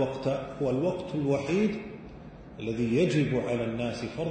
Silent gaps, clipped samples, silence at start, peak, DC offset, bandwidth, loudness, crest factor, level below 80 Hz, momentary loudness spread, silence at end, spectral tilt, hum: none; under 0.1%; 0 s; -14 dBFS; under 0.1%; 9.2 kHz; -29 LUFS; 14 dB; -54 dBFS; 17 LU; 0 s; -7 dB/octave; none